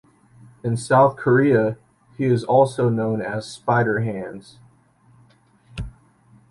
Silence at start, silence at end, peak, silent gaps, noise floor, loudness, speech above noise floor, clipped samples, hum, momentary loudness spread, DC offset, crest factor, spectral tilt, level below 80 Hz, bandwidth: 0.65 s; 0.6 s; -4 dBFS; none; -56 dBFS; -20 LUFS; 36 dB; under 0.1%; none; 19 LU; under 0.1%; 18 dB; -7 dB/octave; -50 dBFS; 11.5 kHz